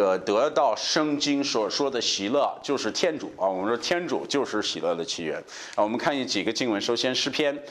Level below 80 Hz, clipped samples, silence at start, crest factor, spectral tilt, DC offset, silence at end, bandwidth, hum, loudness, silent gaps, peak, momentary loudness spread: -68 dBFS; under 0.1%; 0 s; 18 dB; -3 dB/octave; under 0.1%; 0 s; 13 kHz; none; -25 LUFS; none; -8 dBFS; 5 LU